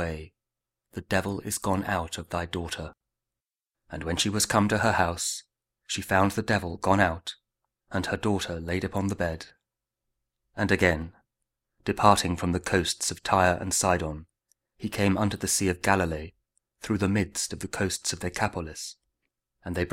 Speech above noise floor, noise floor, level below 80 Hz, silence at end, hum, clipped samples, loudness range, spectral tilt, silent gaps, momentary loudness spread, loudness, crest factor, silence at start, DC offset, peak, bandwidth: over 63 dB; under -90 dBFS; -48 dBFS; 0 s; none; under 0.1%; 6 LU; -4 dB/octave; none; 15 LU; -27 LUFS; 26 dB; 0 s; under 0.1%; -2 dBFS; 16 kHz